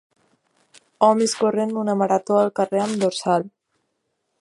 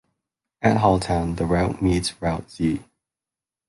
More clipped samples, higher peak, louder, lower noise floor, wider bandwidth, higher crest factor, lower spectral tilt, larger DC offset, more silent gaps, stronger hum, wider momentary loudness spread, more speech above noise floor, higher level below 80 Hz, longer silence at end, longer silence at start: neither; about the same, -2 dBFS vs -4 dBFS; about the same, -20 LUFS vs -22 LUFS; second, -74 dBFS vs -90 dBFS; about the same, 11.5 kHz vs 11.5 kHz; about the same, 20 dB vs 20 dB; about the same, -5 dB/octave vs -6 dB/octave; neither; neither; neither; about the same, 5 LU vs 7 LU; second, 54 dB vs 68 dB; second, -72 dBFS vs -38 dBFS; about the same, 0.95 s vs 0.85 s; first, 1 s vs 0.6 s